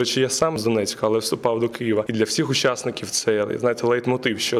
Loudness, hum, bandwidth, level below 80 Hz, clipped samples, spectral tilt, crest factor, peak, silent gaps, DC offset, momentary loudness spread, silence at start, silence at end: -22 LUFS; none; 16 kHz; -58 dBFS; under 0.1%; -4 dB/octave; 16 dB; -6 dBFS; none; under 0.1%; 3 LU; 0 s; 0 s